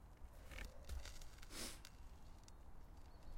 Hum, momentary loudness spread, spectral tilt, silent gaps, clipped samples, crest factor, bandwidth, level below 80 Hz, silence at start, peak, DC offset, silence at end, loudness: none; 12 LU; -3 dB/octave; none; under 0.1%; 18 dB; 16.5 kHz; -56 dBFS; 0 s; -34 dBFS; under 0.1%; 0 s; -57 LUFS